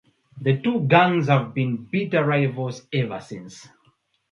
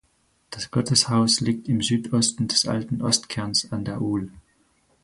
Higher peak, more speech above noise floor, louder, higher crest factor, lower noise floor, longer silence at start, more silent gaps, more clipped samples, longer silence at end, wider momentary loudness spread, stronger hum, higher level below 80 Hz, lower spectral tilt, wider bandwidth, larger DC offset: about the same, -2 dBFS vs -4 dBFS; about the same, 43 dB vs 42 dB; about the same, -22 LUFS vs -22 LUFS; about the same, 22 dB vs 20 dB; about the same, -64 dBFS vs -65 dBFS; second, 0.35 s vs 0.5 s; neither; neither; about the same, 0.7 s vs 0.65 s; first, 16 LU vs 10 LU; neither; second, -66 dBFS vs -54 dBFS; first, -7.5 dB/octave vs -4 dB/octave; second, 7.6 kHz vs 11.5 kHz; neither